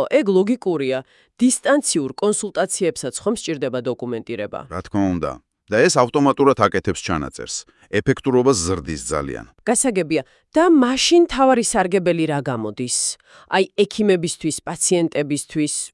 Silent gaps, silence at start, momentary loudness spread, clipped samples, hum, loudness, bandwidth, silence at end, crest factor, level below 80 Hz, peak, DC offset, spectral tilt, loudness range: none; 0 s; 12 LU; under 0.1%; none; -19 LUFS; 12 kHz; 0.05 s; 18 dB; -48 dBFS; 0 dBFS; under 0.1%; -4 dB/octave; 5 LU